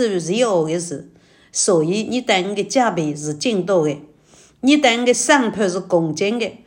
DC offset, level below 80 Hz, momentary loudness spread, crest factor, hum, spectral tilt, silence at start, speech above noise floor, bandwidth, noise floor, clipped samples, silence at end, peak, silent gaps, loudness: under 0.1%; -64 dBFS; 9 LU; 18 dB; none; -3.5 dB/octave; 0 s; 33 dB; 16.5 kHz; -50 dBFS; under 0.1%; 0.1 s; 0 dBFS; none; -18 LUFS